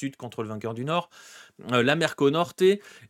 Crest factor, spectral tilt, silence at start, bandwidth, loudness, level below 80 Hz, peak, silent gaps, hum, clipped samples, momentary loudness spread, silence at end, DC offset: 20 dB; -5.5 dB/octave; 0 s; 14 kHz; -25 LUFS; -70 dBFS; -6 dBFS; none; none; under 0.1%; 13 LU; 0.2 s; under 0.1%